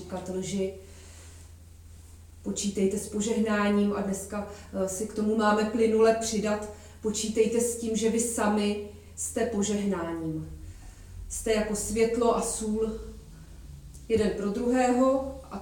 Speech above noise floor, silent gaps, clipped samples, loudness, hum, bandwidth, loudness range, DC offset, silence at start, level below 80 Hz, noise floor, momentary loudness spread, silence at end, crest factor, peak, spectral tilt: 22 dB; none; under 0.1%; -28 LUFS; none; 17 kHz; 5 LU; under 0.1%; 0 s; -50 dBFS; -49 dBFS; 22 LU; 0 s; 18 dB; -10 dBFS; -4.5 dB/octave